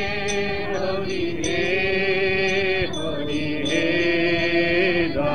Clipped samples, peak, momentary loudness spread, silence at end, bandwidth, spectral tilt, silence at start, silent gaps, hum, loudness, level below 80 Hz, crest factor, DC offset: under 0.1%; -6 dBFS; 6 LU; 0 s; 10 kHz; -4.5 dB/octave; 0 s; none; none; -22 LUFS; -44 dBFS; 16 dB; 3%